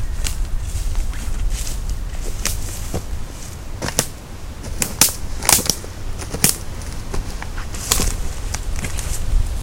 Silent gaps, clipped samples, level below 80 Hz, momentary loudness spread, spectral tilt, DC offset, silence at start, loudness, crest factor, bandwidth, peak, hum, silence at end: none; under 0.1%; -24 dBFS; 16 LU; -2.5 dB/octave; under 0.1%; 0 s; -22 LUFS; 22 dB; 17 kHz; 0 dBFS; none; 0 s